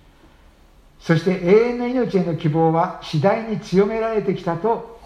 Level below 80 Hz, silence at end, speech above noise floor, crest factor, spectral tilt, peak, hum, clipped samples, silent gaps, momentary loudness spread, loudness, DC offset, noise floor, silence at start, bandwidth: -50 dBFS; 0 s; 31 dB; 18 dB; -8 dB/octave; -2 dBFS; none; under 0.1%; none; 7 LU; -20 LUFS; under 0.1%; -50 dBFS; 1.05 s; 10 kHz